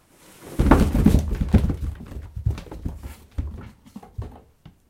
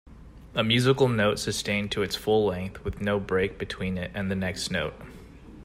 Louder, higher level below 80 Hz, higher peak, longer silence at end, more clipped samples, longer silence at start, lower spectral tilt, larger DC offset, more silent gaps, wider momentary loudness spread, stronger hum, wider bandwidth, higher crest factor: first, -22 LUFS vs -27 LUFS; first, -28 dBFS vs -48 dBFS; first, 0 dBFS vs -8 dBFS; first, 0.5 s vs 0 s; neither; first, 0.4 s vs 0.05 s; first, -8 dB/octave vs -5 dB/octave; neither; neither; first, 21 LU vs 11 LU; neither; about the same, 16 kHz vs 16 kHz; about the same, 22 dB vs 18 dB